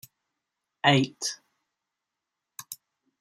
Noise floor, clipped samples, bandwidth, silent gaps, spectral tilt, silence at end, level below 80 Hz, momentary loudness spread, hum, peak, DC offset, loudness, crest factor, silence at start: -86 dBFS; under 0.1%; 16 kHz; none; -4 dB/octave; 0.45 s; -72 dBFS; 23 LU; none; -6 dBFS; under 0.1%; -25 LUFS; 26 dB; 0.85 s